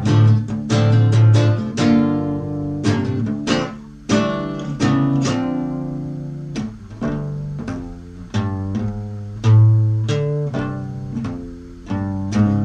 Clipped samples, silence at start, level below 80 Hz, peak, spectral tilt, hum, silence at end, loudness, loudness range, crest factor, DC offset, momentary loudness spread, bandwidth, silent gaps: under 0.1%; 0 s; -42 dBFS; -4 dBFS; -7.5 dB/octave; none; 0 s; -19 LUFS; 9 LU; 14 dB; under 0.1%; 15 LU; 8.4 kHz; none